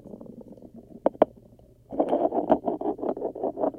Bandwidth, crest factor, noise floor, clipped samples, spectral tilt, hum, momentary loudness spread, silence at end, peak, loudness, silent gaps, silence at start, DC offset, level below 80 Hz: 9.2 kHz; 24 dB; -54 dBFS; under 0.1%; -9 dB/octave; none; 21 LU; 0 s; -4 dBFS; -27 LUFS; none; 0.05 s; under 0.1%; -60 dBFS